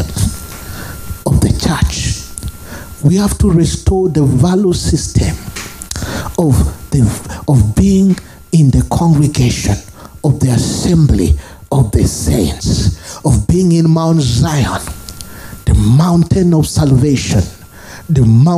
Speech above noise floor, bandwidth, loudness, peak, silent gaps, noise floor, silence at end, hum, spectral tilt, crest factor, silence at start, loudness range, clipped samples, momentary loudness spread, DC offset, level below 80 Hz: 22 dB; 15.5 kHz; -13 LUFS; 0 dBFS; none; -33 dBFS; 0 s; none; -6.5 dB/octave; 12 dB; 0 s; 2 LU; under 0.1%; 15 LU; under 0.1%; -24 dBFS